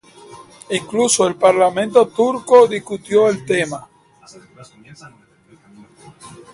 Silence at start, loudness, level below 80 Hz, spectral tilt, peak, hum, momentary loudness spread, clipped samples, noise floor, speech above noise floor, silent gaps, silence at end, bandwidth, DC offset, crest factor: 0.35 s; -15 LUFS; -60 dBFS; -3.5 dB/octave; 0 dBFS; none; 12 LU; under 0.1%; -50 dBFS; 34 dB; none; 0.25 s; 11.5 kHz; under 0.1%; 18 dB